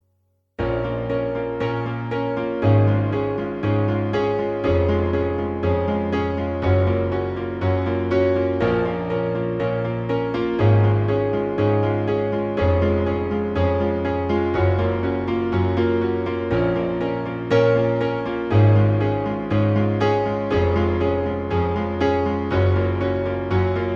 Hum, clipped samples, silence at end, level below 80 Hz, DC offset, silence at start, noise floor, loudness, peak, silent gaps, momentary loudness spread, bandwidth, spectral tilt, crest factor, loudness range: none; under 0.1%; 0 s; -40 dBFS; under 0.1%; 0.6 s; -67 dBFS; -21 LUFS; -6 dBFS; none; 7 LU; 6.2 kHz; -9 dB/octave; 14 dB; 2 LU